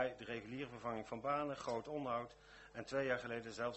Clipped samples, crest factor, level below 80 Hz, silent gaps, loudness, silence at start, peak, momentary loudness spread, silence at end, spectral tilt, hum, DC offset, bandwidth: under 0.1%; 18 dB; -70 dBFS; none; -43 LUFS; 0 s; -24 dBFS; 11 LU; 0 s; -5.5 dB/octave; none; under 0.1%; 8.2 kHz